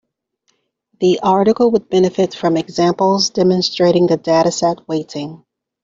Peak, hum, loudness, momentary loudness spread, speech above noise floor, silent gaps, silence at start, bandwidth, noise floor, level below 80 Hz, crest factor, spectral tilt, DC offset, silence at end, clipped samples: -2 dBFS; none; -15 LUFS; 9 LU; 52 dB; none; 1 s; 7.6 kHz; -66 dBFS; -56 dBFS; 12 dB; -5.5 dB/octave; under 0.1%; 0.5 s; under 0.1%